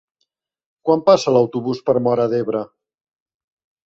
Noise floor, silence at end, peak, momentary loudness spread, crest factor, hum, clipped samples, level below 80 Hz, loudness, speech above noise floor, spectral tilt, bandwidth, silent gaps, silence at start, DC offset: -73 dBFS; 1.2 s; -2 dBFS; 12 LU; 18 dB; none; under 0.1%; -62 dBFS; -18 LUFS; 57 dB; -6.5 dB/octave; 7.8 kHz; none; 0.85 s; under 0.1%